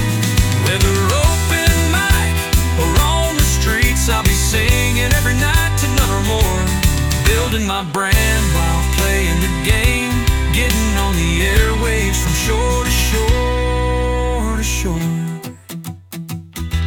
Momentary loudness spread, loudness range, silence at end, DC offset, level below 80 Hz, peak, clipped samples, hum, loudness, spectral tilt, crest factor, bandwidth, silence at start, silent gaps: 5 LU; 3 LU; 0 s; under 0.1%; -20 dBFS; -2 dBFS; under 0.1%; none; -16 LUFS; -4 dB/octave; 14 dB; 18 kHz; 0 s; none